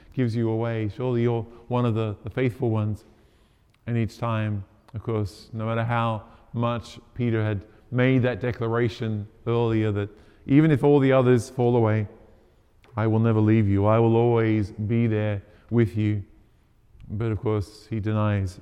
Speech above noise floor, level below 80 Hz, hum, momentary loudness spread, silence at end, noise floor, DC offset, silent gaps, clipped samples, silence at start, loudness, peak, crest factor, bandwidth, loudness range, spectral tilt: 37 dB; -54 dBFS; none; 13 LU; 0 s; -60 dBFS; under 0.1%; none; under 0.1%; 0.15 s; -24 LUFS; -6 dBFS; 18 dB; 9.8 kHz; 7 LU; -8.5 dB/octave